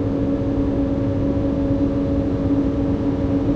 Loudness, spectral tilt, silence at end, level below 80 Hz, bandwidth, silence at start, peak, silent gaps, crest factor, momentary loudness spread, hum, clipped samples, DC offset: -21 LUFS; -10 dB/octave; 0 s; -30 dBFS; 6.4 kHz; 0 s; -8 dBFS; none; 10 dB; 1 LU; none; under 0.1%; under 0.1%